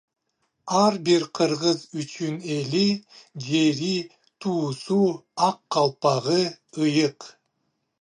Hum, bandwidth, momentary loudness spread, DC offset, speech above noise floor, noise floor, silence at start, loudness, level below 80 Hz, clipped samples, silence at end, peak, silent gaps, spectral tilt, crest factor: none; 10 kHz; 10 LU; under 0.1%; 52 dB; -75 dBFS; 0.65 s; -24 LUFS; -72 dBFS; under 0.1%; 0.7 s; -6 dBFS; none; -5 dB/octave; 18 dB